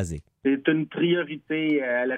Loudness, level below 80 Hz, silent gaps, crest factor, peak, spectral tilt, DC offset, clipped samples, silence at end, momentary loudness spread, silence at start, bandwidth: -25 LUFS; -52 dBFS; none; 16 dB; -8 dBFS; -6 dB/octave; under 0.1%; under 0.1%; 0 s; 5 LU; 0 s; 10 kHz